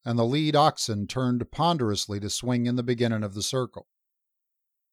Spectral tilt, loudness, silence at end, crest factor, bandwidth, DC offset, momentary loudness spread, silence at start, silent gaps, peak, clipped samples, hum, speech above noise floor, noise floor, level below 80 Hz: -5 dB/octave; -26 LUFS; 1.1 s; 20 dB; 14 kHz; under 0.1%; 7 LU; 0.05 s; none; -6 dBFS; under 0.1%; none; 57 dB; -82 dBFS; -58 dBFS